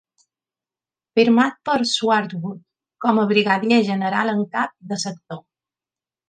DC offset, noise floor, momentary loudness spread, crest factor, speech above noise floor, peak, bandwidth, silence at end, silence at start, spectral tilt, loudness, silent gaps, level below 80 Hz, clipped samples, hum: under 0.1%; under -90 dBFS; 15 LU; 18 dB; over 71 dB; -2 dBFS; 9.6 kHz; 0.9 s; 1.15 s; -4.5 dB/octave; -20 LUFS; none; -68 dBFS; under 0.1%; none